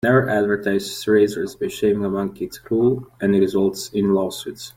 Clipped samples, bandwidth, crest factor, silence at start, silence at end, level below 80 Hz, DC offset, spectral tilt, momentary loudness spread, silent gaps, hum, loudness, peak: under 0.1%; 16.5 kHz; 16 dB; 0.05 s; 0.05 s; -54 dBFS; under 0.1%; -6 dB/octave; 9 LU; none; none; -20 LUFS; -4 dBFS